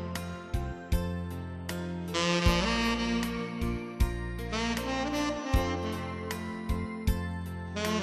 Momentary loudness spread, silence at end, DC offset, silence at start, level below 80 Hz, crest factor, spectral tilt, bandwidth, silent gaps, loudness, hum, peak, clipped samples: 10 LU; 0 s; under 0.1%; 0 s; -38 dBFS; 22 dB; -5 dB/octave; 14 kHz; none; -32 LUFS; none; -10 dBFS; under 0.1%